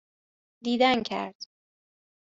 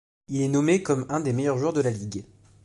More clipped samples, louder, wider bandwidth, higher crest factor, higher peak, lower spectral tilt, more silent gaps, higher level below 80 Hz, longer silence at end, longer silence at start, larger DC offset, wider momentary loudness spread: neither; about the same, -26 LUFS vs -25 LUFS; second, 7.8 kHz vs 11.5 kHz; first, 22 dB vs 16 dB; about the same, -8 dBFS vs -10 dBFS; second, -4.5 dB/octave vs -6.5 dB/octave; first, 1.35-1.40 s vs none; second, -68 dBFS vs -60 dBFS; first, 0.8 s vs 0.4 s; first, 0.65 s vs 0.3 s; neither; first, 21 LU vs 11 LU